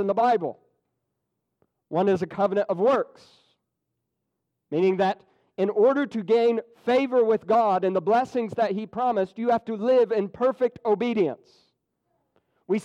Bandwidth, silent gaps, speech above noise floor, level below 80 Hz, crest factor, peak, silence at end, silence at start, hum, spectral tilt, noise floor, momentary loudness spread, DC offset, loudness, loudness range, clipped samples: 8.4 kHz; none; 58 dB; -70 dBFS; 14 dB; -12 dBFS; 0 s; 0 s; none; -7 dB/octave; -81 dBFS; 7 LU; under 0.1%; -24 LUFS; 5 LU; under 0.1%